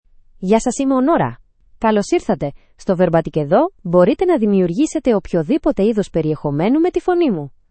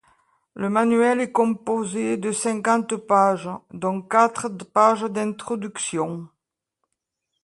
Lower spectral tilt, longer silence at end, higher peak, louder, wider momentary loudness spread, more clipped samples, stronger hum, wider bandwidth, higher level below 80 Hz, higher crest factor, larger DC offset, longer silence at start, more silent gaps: first, -7 dB/octave vs -5 dB/octave; second, 0.25 s vs 1.2 s; first, 0 dBFS vs -4 dBFS; first, -17 LUFS vs -22 LUFS; second, 7 LU vs 11 LU; neither; neither; second, 8.8 kHz vs 11.5 kHz; first, -42 dBFS vs -68 dBFS; about the same, 16 dB vs 20 dB; neither; second, 0.4 s vs 0.55 s; neither